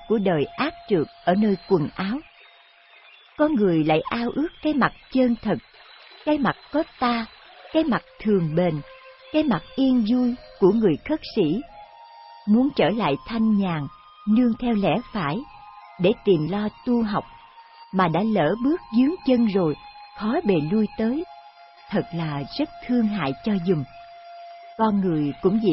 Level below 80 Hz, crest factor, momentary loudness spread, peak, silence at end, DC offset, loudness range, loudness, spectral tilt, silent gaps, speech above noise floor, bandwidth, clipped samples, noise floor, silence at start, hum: -52 dBFS; 18 dB; 10 LU; -6 dBFS; 0 s; under 0.1%; 3 LU; -23 LUFS; -11.5 dB/octave; none; 31 dB; 5.8 kHz; under 0.1%; -52 dBFS; 0 s; none